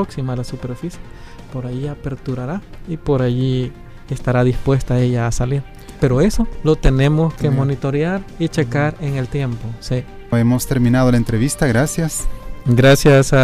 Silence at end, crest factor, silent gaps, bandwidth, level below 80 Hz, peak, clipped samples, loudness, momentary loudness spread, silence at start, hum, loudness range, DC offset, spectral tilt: 0 s; 14 dB; none; 15.5 kHz; -28 dBFS; -2 dBFS; under 0.1%; -18 LUFS; 13 LU; 0 s; none; 6 LU; under 0.1%; -6.5 dB/octave